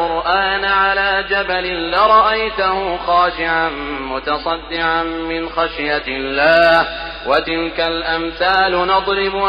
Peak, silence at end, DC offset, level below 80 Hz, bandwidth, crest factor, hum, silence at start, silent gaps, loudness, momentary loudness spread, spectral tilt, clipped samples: -2 dBFS; 0 s; under 0.1%; -38 dBFS; 6.6 kHz; 14 dB; none; 0 s; none; -16 LUFS; 9 LU; -5.5 dB/octave; under 0.1%